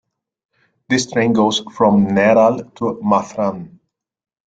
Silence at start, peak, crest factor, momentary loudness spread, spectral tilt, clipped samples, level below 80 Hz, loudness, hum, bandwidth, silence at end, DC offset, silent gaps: 0.9 s; -2 dBFS; 16 dB; 10 LU; -5.5 dB/octave; under 0.1%; -56 dBFS; -16 LUFS; none; 9 kHz; 0.8 s; under 0.1%; none